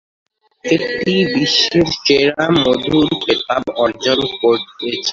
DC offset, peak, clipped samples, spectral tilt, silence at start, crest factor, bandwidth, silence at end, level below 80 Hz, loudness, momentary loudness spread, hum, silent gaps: under 0.1%; 0 dBFS; under 0.1%; -4.5 dB/octave; 0.65 s; 14 dB; 7.6 kHz; 0 s; -48 dBFS; -15 LUFS; 6 LU; none; none